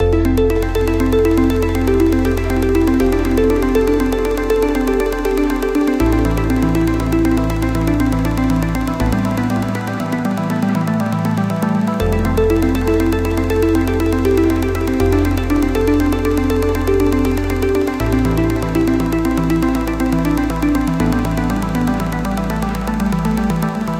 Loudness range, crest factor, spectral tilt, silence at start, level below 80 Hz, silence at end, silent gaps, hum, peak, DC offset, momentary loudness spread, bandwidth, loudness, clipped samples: 3 LU; 14 dB; -7 dB/octave; 0 s; -24 dBFS; 0 s; none; none; -2 dBFS; under 0.1%; 4 LU; 17 kHz; -16 LUFS; under 0.1%